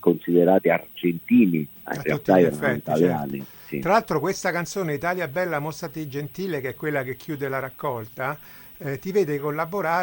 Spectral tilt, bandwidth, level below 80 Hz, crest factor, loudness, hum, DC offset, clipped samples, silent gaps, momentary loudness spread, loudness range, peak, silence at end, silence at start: -6.5 dB/octave; 17 kHz; -58 dBFS; 20 dB; -24 LUFS; none; under 0.1%; under 0.1%; none; 13 LU; 7 LU; -4 dBFS; 0 s; 0 s